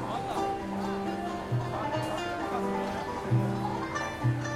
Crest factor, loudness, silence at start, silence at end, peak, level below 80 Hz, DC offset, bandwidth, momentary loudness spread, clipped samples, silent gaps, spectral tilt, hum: 16 dB; -32 LUFS; 0 s; 0 s; -16 dBFS; -52 dBFS; under 0.1%; 14 kHz; 4 LU; under 0.1%; none; -6.5 dB/octave; none